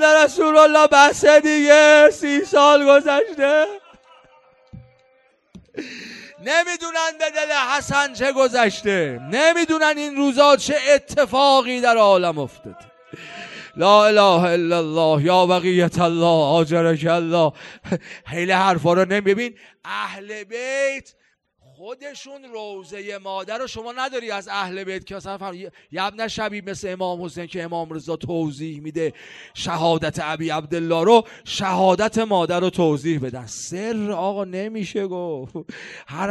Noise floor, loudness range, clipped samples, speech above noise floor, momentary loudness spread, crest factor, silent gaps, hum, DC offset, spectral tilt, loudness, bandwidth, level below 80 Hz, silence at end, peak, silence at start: -60 dBFS; 14 LU; under 0.1%; 41 dB; 21 LU; 18 dB; none; none; under 0.1%; -4.5 dB/octave; -18 LUFS; 12 kHz; -58 dBFS; 0 s; 0 dBFS; 0 s